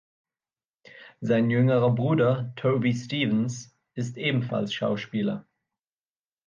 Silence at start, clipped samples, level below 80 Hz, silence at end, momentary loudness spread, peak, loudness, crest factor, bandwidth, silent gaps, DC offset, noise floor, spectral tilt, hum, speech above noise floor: 0.95 s; under 0.1%; -68 dBFS; 1.05 s; 13 LU; -10 dBFS; -26 LUFS; 16 dB; 7.4 kHz; none; under 0.1%; under -90 dBFS; -7 dB/octave; none; over 65 dB